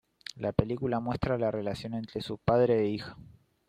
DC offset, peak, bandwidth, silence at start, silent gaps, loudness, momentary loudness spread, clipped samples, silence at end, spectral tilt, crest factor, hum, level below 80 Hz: under 0.1%; -8 dBFS; 12 kHz; 0.35 s; none; -30 LUFS; 12 LU; under 0.1%; 0.45 s; -7.5 dB/octave; 22 dB; none; -52 dBFS